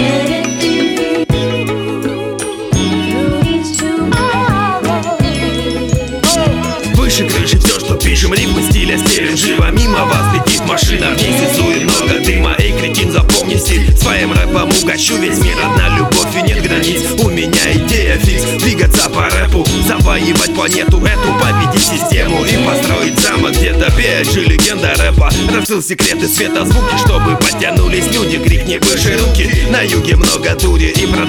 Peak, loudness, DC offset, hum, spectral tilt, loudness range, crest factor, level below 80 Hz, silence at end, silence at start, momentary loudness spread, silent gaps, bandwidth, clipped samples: 0 dBFS; -11 LUFS; under 0.1%; none; -4 dB/octave; 3 LU; 12 dB; -16 dBFS; 0 s; 0 s; 4 LU; none; over 20 kHz; under 0.1%